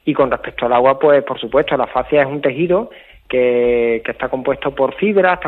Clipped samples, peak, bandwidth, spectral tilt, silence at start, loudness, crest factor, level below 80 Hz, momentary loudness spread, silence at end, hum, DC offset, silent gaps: under 0.1%; 0 dBFS; 4.3 kHz; -8.5 dB/octave; 0.05 s; -16 LUFS; 16 dB; -46 dBFS; 7 LU; 0 s; none; under 0.1%; none